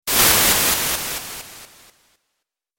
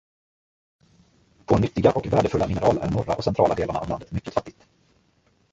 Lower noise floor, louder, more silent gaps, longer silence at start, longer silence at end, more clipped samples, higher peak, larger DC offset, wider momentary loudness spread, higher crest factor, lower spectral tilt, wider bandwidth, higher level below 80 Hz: first, -78 dBFS vs -64 dBFS; first, -16 LUFS vs -23 LUFS; neither; second, 0.05 s vs 1.5 s; first, 1.15 s vs 1 s; neither; about the same, -2 dBFS vs -2 dBFS; neither; first, 21 LU vs 9 LU; about the same, 20 dB vs 22 dB; second, -0.5 dB/octave vs -7.5 dB/octave; first, 17 kHz vs 8 kHz; about the same, -42 dBFS vs -44 dBFS